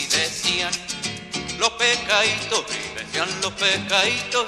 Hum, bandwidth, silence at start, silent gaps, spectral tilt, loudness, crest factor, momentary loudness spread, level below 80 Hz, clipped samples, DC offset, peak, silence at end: none; 15 kHz; 0 s; none; -1 dB/octave; -21 LUFS; 18 dB; 10 LU; -52 dBFS; under 0.1%; under 0.1%; -4 dBFS; 0 s